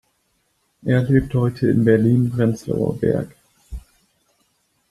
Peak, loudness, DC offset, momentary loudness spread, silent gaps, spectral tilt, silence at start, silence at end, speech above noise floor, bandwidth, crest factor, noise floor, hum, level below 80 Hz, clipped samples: -2 dBFS; -19 LUFS; under 0.1%; 23 LU; none; -9 dB/octave; 0.85 s; 1.1 s; 49 dB; 12.5 kHz; 18 dB; -67 dBFS; none; -44 dBFS; under 0.1%